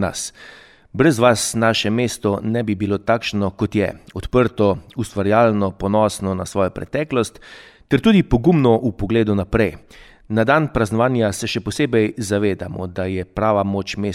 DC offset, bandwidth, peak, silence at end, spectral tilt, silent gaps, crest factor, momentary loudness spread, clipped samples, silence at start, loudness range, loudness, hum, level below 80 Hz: under 0.1%; 15.5 kHz; -2 dBFS; 0 s; -5.5 dB/octave; none; 16 dB; 9 LU; under 0.1%; 0 s; 2 LU; -19 LUFS; none; -40 dBFS